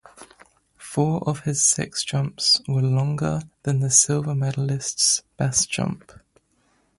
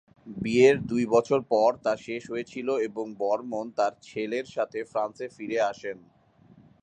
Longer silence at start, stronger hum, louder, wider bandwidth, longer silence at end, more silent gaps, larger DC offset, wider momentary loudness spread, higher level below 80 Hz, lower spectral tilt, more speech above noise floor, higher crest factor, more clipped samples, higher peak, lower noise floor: about the same, 0.2 s vs 0.25 s; neither; first, -21 LUFS vs -27 LUFS; first, 11.5 kHz vs 9.2 kHz; first, 1 s vs 0.85 s; neither; neither; second, 10 LU vs 14 LU; first, -54 dBFS vs -64 dBFS; second, -3.5 dB/octave vs -5.5 dB/octave; first, 42 dB vs 30 dB; about the same, 22 dB vs 20 dB; neither; first, -2 dBFS vs -6 dBFS; first, -65 dBFS vs -57 dBFS